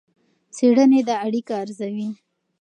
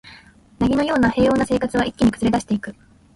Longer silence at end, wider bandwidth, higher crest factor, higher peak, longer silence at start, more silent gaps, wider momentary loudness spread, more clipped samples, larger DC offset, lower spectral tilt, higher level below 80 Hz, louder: about the same, 0.45 s vs 0.45 s; second, 9.4 kHz vs 11.5 kHz; about the same, 16 dB vs 14 dB; about the same, -6 dBFS vs -6 dBFS; first, 0.55 s vs 0.05 s; neither; first, 17 LU vs 8 LU; neither; neither; about the same, -6 dB/octave vs -6 dB/octave; second, -76 dBFS vs -40 dBFS; about the same, -20 LUFS vs -19 LUFS